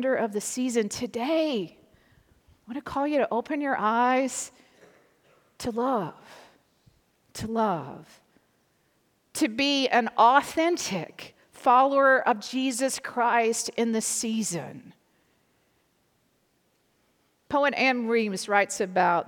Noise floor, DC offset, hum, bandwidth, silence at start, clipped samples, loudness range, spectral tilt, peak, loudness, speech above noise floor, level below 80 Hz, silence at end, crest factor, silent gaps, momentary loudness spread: -69 dBFS; under 0.1%; none; 19 kHz; 0 s; under 0.1%; 11 LU; -3 dB/octave; -6 dBFS; -25 LUFS; 44 dB; -66 dBFS; 0 s; 20 dB; none; 17 LU